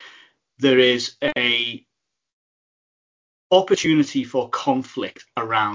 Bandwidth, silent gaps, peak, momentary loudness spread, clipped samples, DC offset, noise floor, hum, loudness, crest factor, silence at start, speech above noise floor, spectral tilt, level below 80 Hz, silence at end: 7.6 kHz; 2.33-3.50 s; -2 dBFS; 13 LU; under 0.1%; under 0.1%; -52 dBFS; none; -20 LUFS; 20 dB; 0 s; 32 dB; -4 dB/octave; -64 dBFS; 0 s